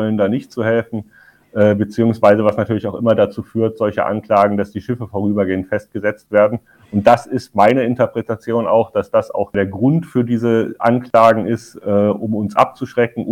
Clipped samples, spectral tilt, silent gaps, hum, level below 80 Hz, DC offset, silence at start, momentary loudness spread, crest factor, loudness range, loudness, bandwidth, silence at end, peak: under 0.1%; -8 dB/octave; none; none; -54 dBFS; under 0.1%; 0 s; 9 LU; 16 dB; 2 LU; -16 LUFS; 15 kHz; 0 s; 0 dBFS